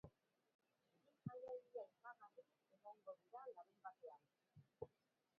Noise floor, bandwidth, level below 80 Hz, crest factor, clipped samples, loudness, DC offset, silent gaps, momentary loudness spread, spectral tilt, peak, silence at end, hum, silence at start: -87 dBFS; 4.8 kHz; -86 dBFS; 24 dB; under 0.1%; -59 LUFS; under 0.1%; 0.55-0.59 s; 10 LU; -7.5 dB/octave; -36 dBFS; 0.5 s; none; 0.05 s